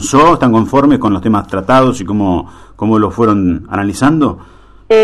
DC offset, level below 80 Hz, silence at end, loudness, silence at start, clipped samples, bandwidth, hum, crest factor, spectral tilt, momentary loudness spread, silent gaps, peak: under 0.1%; -36 dBFS; 0 s; -12 LUFS; 0 s; under 0.1%; 12.5 kHz; none; 10 dB; -6.5 dB/octave; 8 LU; none; 0 dBFS